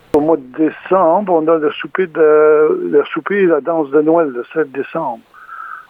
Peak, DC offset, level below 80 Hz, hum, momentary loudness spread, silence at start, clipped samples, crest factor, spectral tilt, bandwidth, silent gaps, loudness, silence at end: 0 dBFS; under 0.1%; -56 dBFS; none; 11 LU; 0.15 s; under 0.1%; 14 dB; -8 dB/octave; 3.9 kHz; none; -14 LUFS; 0.1 s